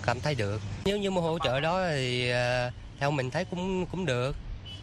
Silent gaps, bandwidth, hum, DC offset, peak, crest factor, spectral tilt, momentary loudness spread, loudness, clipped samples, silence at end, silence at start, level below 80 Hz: none; 12.5 kHz; none; under 0.1%; -12 dBFS; 18 dB; -5.5 dB/octave; 6 LU; -29 LUFS; under 0.1%; 0 s; 0 s; -46 dBFS